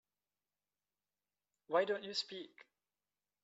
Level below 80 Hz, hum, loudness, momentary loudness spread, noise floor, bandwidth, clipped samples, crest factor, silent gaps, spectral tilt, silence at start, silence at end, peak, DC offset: under -90 dBFS; 50 Hz at -75 dBFS; -38 LUFS; 15 LU; under -90 dBFS; 7.6 kHz; under 0.1%; 24 dB; none; -0.5 dB/octave; 1.7 s; 0.8 s; -20 dBFS; under 0.1%